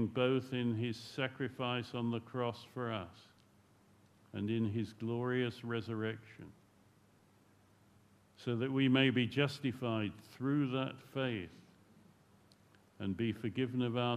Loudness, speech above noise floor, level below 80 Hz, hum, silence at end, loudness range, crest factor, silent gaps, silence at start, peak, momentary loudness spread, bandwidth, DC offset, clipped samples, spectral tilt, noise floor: -37 LUFS; 31 dB; -76 dBFS; none; 0 s; 7 LU; 22 dB; none; 0 s; -16 dBFS; 11 LU; 13 kHz; under 0.1%; under 0.1%; -7 dB/octave; -67 dBFS